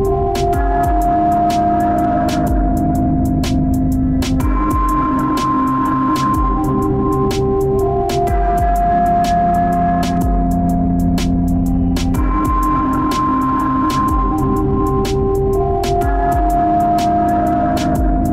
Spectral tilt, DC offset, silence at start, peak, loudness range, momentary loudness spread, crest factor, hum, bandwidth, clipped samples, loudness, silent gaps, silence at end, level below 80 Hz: -7 dB/octave; under 0.1%; 0 s; -6 dBFS; 1 LU; 2 LU; 8 dB; none; 16 kHz; under 0.1%; -16 LUFS; none; 0 s; -22 dBFS